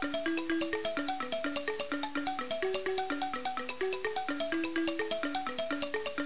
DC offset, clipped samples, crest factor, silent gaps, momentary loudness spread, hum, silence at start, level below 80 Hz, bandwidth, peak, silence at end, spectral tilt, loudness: 0.6%; under 0.1%; 14 dB; none; 3 LU; none; 0 s; -66 dBFS; 4 kHz; -20 dBFS; 0 s; -1 dB/octave; -34 LUFS